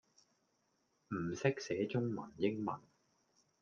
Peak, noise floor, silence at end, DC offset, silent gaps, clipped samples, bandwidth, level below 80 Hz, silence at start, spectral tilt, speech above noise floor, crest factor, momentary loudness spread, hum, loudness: -20 dBFS; -80 dBFS; 0.85 s; under 0.1%; none; under 0.1%; 7.4 kHz; -76 dBFS; 1.1 s; -6.5 dB/octave; 42 dB; 22 dB; 7 LU; none; -39 LUFS